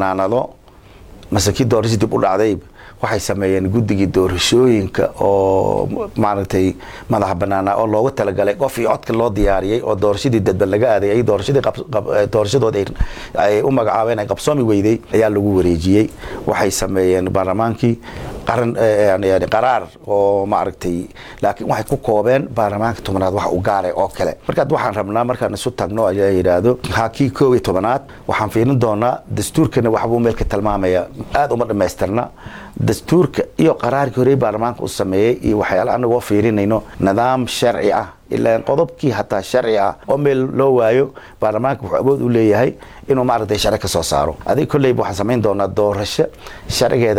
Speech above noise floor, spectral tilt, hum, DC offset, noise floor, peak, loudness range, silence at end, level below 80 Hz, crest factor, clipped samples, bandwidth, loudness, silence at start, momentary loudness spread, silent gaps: 26 dB; -6 dB/octave; none; under 0.1%; -42 dBFS; -2 dBFS; 2 LU; 0 s; -36 dBFS; 14 dB; under 0.1%; 17 kHz; -16 LUFS; 0 s; 6 LU; none